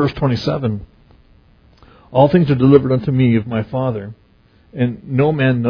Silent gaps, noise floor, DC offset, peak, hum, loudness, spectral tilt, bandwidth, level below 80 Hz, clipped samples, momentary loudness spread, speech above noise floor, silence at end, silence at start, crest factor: none; -51 dBFS; under 0.1%; 0 dBFS; none; -16 LUFS; -9.5 dB/octave; 5.4 kHz; -44 dBFS; under 0.1%; 12 LU; 36 dB; 0 s; 0 s; 16 dB